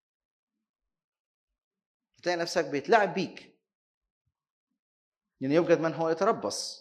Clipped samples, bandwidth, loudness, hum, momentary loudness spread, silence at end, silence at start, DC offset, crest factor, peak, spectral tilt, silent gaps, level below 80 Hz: under 0.1%; 13 kHz; -28 LUFS; none; 10 LU; 0 s; 2.25 s; under 0.1%; 24 dB; -8 dBFS; -4.5 dB/octave; 3.75-4.01 s, 4.10-4.25 s, 4.50-4.67 s, 4.79-5.12 s; -78 dBFS